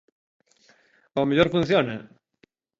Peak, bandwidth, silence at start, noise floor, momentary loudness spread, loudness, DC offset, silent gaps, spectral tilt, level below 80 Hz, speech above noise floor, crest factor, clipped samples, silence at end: -4 dBFS; 7.8 kHz; 1.15 s; -64 dBFS; 11 LU; -23 LUFS; under 0.1%; none; -7 dB/octave; -54 dBFS; 42 dB; 22 dB; under 0.1%; 0.75 s